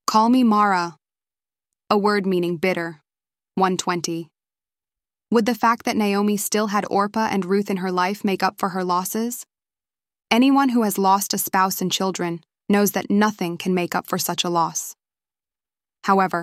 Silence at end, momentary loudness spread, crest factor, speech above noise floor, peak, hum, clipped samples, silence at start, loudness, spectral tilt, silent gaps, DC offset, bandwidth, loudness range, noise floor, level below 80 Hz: 0 s; 10 LU; 20 dB; over 70 dB; -2 dBFS; none; under 0.1%; 0.1 s; -21 LUFS; -4.5 dB/octave; none; under 0.1%; 16 kHz; 4 LU; under -90 dBFS; -68 dBFS